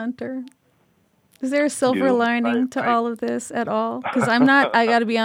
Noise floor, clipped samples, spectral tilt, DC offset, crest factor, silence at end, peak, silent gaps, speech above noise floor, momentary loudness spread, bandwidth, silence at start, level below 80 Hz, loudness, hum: -62 dBFS; under 0.1%; -4.5 dB/octave; under 0.1%; 16 dB; 0 s; -4 dBFS; none; 42 dB; 13 LU; 15 kHz; 0 s; -72 dBFS; -20 LUFS; none